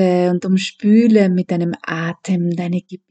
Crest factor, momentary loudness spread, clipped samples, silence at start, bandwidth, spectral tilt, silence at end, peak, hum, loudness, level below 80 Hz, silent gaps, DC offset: 16 dB; 11 LU; under 0.1%; 0 s; 8.8 kHz; -7 dB/octave; 0.15 s; 0 dBFS; none; -17 LUFS; -70 dBFS; none; under 0.1%